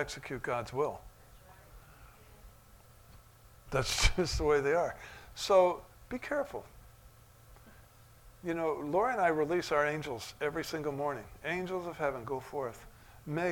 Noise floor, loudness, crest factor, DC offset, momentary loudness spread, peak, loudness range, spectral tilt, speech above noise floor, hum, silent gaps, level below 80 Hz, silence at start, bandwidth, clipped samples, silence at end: -58 dBFS; -33 LUFS; 22 dB; under 0.1%; 14 LU; -12 dBFS; 9 LU; -4 dB/octave; 25 dB; none; none; -48 dBFS; 0 s; 19 kHz; under 0.1%; 0 s